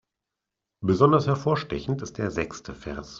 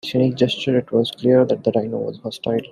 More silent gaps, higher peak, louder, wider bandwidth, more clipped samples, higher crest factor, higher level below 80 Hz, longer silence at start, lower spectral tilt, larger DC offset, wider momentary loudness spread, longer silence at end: neither; about the same, -4 dBFS vs -2 dBFS; second, -25 LUFS vs -19 LUFS; second, 7.6 kHz vs 13 kHz; neither; first, 22 dB vs 16 dB; first, -50 dBFS vs -60 dBFS; first, 0.8 s vs 0.05 s; about the same, -7 dB/octave vs -7 dB/octave; neither; first, 16 LU vs 10 LU; about the same, 0 s vs 0.05 s